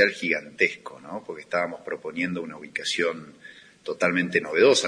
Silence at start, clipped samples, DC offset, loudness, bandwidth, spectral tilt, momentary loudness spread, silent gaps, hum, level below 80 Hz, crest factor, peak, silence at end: 0 s; under 0.1%; under 0.1%; -25 LUFS; 10.5 kHz; -3.5 dB/octave; 18 LU; none; none; -72 dBFS; 22 dB; -4 dBFS; 0 s